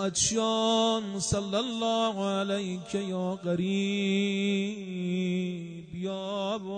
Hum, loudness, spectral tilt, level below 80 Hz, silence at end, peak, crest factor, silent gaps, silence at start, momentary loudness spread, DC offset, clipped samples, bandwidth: none; -29 LUFS; -4 dB/octave; -58 dBFS; 0 s; -12 dBFS; 16 dB; none; 0 s; 9 LU; under 0.1%; under 0.1%; 9.6 kHz